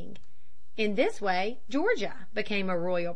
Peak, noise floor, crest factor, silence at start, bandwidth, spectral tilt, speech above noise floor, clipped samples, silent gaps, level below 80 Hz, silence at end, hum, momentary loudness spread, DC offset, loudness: -12 dBFS; -63 dBFS; 18 dB; 0 s; 10.5 kHz; -5.5 dB/octave; 33 dB; under 0.1%; none; -64 dBFS; 0 s; none; 8 LU; 3%; -30 LUFS